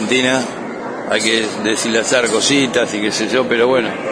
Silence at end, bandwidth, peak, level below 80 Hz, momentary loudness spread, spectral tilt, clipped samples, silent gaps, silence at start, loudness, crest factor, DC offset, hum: 0 s; 11 kHz; 0 dBFS; -58 dBFS; 8 LU; -2.5 dB/octave; under 0.1%; none; 0 s; -15 LUFS; 16 dB; under 0.1%; none